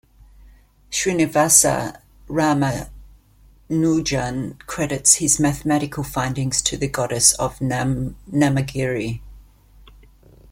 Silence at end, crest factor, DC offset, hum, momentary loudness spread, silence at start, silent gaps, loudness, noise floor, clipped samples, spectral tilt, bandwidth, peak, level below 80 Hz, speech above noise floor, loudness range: 1.1 s; 22 dB; under 0.1%; none; 13 LU; 0.45 s; none; -19 LUFS; -51 dBFS; under 0.1%; -3.5 dB/octave; 16.5 kHz; 0 dBFS; -44 dBFS; 32 dB; 4 LU